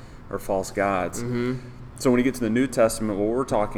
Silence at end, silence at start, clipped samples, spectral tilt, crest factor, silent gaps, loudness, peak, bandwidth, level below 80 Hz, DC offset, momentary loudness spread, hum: 0 s; 0 s; under 0.1%; -5.5 dB/octave; 16 dB; none; -24 LUFS; -8 dBFS; 17 kHz; -42 dBFS; under 0.1%; 11 LU; none